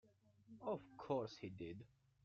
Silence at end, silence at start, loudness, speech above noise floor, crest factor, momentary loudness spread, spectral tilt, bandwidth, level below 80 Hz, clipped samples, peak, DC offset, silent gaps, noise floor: 0.4 s; 0.05 s; -49 LUFS; 22 dB; 22 dB; 17 LU; -6 dB/octave; 7.6 kHz; -80 dBFS; under 0.1%; -28 dBFS; under 0.1%; none; -68 dBFS